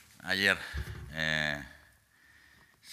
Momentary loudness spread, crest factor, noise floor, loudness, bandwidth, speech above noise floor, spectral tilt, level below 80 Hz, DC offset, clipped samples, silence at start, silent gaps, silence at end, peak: 14 LU; 26 dB; -63 dBFS; -31 LUFS; 15.5 kHz; 31 dB; -3.5 dB/octave; -50 dBFS; under 0.1%; under 0.1%; 0.2 s; none; 0 s; -8 dBFS